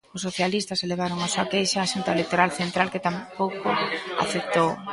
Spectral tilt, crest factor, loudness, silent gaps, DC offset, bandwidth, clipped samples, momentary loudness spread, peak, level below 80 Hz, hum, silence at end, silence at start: -4 dB/octave; 22 dB; -25 LUFS; none; under 0.1%; 11.5 kHz; under 0.1%; 5 LU; -4 dBFS; -62 dBFS; none; 0 s; 0.15 s